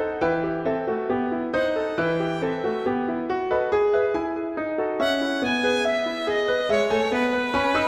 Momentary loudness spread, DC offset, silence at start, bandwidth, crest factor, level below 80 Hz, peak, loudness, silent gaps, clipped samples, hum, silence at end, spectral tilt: 5 LU; under 0.1%; 0 s; 13 kHz; 14 dB; -52 dBFS; -8 dBFS; -24 LUFS; none; under 0.1%; none; 0 s; -5 dB/octave